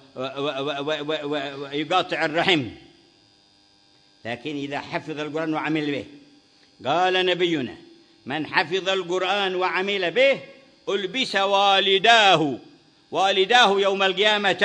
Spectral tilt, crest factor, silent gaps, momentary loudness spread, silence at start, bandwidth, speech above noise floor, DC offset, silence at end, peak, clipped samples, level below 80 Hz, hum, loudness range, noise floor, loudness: -3.5 dB/octave; 22 dB; none; 14 LU; 0.15 s; 10 kHz; 36 dB; under 0.1%; 0 s; 0 dBFS; under 0.1%; -68 dBFS; none; 11 LU; -58 dBFS; -21 LUFS